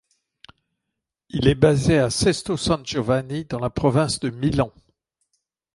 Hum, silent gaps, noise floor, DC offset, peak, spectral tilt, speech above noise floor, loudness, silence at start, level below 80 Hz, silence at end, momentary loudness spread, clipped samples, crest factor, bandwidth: none; none; -82 dBFS; under 0.1%; -2 dBFS; -5.5 dB/octave; 62 dB; -21 LUFS; 1.35 s; -42 dBFS; 1.05 s; 9 LU; under 0.1%; 20 dB; 11.5 kHz